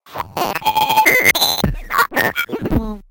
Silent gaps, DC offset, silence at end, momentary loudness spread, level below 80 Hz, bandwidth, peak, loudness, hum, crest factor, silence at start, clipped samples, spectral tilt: none; under 0.1%; 0.1 s; 11 LU; -32 dBFS; 18 kHz; 0 dBFS; -15 LUFS; none; 16 dB; 0.1 s; under 0.1%; -3 dB/octave